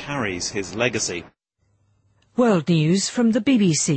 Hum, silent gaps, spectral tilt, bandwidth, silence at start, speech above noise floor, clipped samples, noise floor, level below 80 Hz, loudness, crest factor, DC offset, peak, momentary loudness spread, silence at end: none; none; -4.5 dB/octave; 8.8 kHz; 0 s; 47 dB; under 0.1%; -67 dBFS; -56 dBFS; -21 LUFS; 16 dB; under 0.1%; -6 dBFS; 8 LU; 0 s